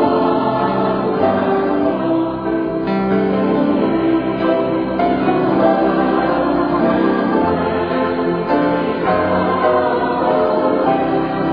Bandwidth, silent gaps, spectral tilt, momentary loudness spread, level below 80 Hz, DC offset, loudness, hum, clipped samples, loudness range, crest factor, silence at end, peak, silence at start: 5.2 kHz; none; -10 dB/octave; 3 LU; -44 dBFS; 0.2%; -16 LUFS; none; under 0.1%; 1 LU; 14 dB; 0 s; -2 dBFS; 0 s